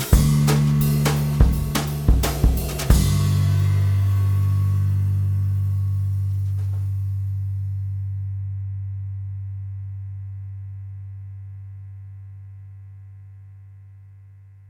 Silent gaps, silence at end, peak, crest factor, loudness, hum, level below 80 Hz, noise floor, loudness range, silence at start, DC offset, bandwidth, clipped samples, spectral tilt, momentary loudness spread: none; 0.2 s; -2 dBFS; 20 dB; -22 LUFS; 50 Hz at -50 dBFS; -28 dBFS; -45 dBFS; 18 LU; 0 s; under 0.1%; 19.5 kHz; under 0.1%; -6.5 dB/octave; 21 LU